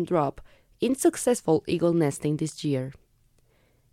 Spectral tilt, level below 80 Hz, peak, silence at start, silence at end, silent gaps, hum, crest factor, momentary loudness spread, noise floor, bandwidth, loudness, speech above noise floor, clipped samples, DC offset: -6 dB/octave; -58 dBFS; -10 dBFS; 0 s; 1 s; none; none; 16 dB; 7 LU; -64 dBFS; 16 kHz; -26 LUFS; 39 dB; under 0.1%; under 0.1%